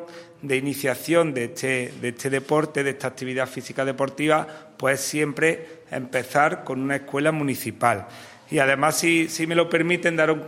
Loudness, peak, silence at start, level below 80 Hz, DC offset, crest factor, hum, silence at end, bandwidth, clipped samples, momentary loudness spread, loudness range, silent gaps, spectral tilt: -23 LUFS; -4 dBFS; 0 s; -68 dBFS; under 0.1%; 20 dB; none; 0 s; 16 kHz; under 0.1%; 9 LU; 3 LU; none; -4.5 dB/octave